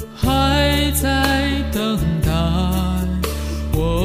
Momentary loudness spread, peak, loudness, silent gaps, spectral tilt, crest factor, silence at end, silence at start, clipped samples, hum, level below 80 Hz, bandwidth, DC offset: 6 LU; -2 dBFS; -19 LUFS; none; -5 dB/octave; 16 dB; 0 s; 0 s; under 0.1%; none; -24 dBFS; 16 kHz; under 0.1%